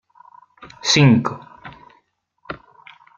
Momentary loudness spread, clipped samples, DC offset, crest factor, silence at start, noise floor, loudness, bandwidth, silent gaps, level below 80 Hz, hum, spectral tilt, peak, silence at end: 27 LU; under 0.1%; under 0.1%; 20 dB; 0.6 s; -63 dBFS; -16 LUFS; 7.4 kHz; none; -56 dBFS; none; -5 dB/octave; -2 dBFS; 0.6 s